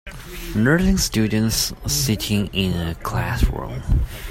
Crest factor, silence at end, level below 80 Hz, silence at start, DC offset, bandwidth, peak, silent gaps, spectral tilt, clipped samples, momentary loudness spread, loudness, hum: 18 dB; 0 s; -28 dBFS; 0.05 s; under 0.1%; 16.5 kHz; -4 dBFS; none; -4.5 dB/octave; under 0.1%; 8 LU; -21 LUFS; none